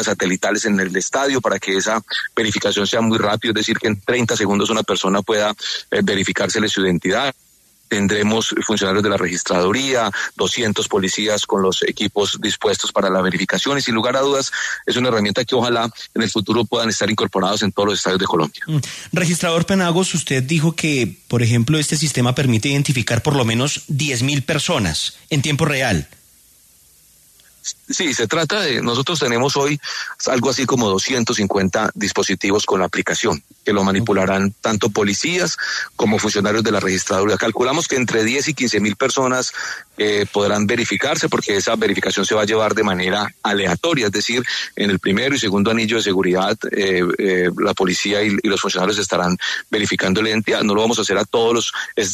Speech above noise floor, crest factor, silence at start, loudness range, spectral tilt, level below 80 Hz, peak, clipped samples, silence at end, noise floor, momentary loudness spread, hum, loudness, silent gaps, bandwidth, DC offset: 33 dB; 14 dB; 0 s; 1 LU; -4 dB/octave; -52 dBFS; -4 dBFS; under 0.1%; 0 s; -51 dBFS; 3 LU; none; -18 LUFS; none; 14 kHz; under 0.1%